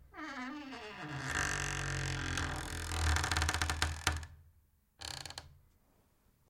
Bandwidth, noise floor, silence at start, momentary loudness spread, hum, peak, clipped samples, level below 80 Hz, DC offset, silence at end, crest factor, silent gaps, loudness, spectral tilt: 16.5 kHz; -71 dBFS; 0 s; 13 LU; none; -14 dBFS; under 0.1%; -48 dBFS; under 0.1%; 0.95 s; 26 dB; none; -37 LUFS; -3 dB/octave